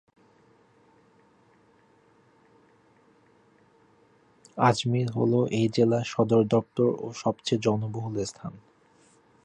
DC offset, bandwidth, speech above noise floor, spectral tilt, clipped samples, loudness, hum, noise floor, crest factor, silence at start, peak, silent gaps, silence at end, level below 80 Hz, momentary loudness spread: under 0.1%; 10 kHz; 36 dB; -6.5 dB/octave; under 0.1%; -26 LUFS; none; -61 dBFS; 22 dB; 4.55 s; -6 dBFS; none; 0.85 s; -64 dBFS; 10 LU